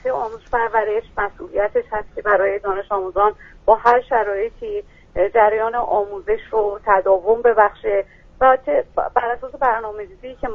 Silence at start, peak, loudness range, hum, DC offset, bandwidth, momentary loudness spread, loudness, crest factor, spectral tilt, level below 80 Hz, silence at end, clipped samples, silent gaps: 0.05 s; 0 dBFS; 3 LU; none; under 0.1%; 6.6 kHz; 10 LU; -19 LUFS; 18 dB; -6.5 dB/octave; -44 dBFS; 0 s; under 0.1%; none